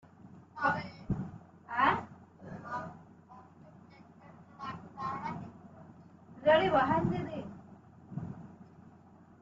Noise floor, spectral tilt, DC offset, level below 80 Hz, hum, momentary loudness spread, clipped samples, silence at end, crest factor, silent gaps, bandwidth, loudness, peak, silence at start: -58 dBFS; -4.5 dB/octave; under 0.1%; -62 dBFS; none; 27 LU; under 0.1%; 0.5 s; 24 dB; none; 7.6 kHz; -33 LUFS; -12 dBFS; 0.2 s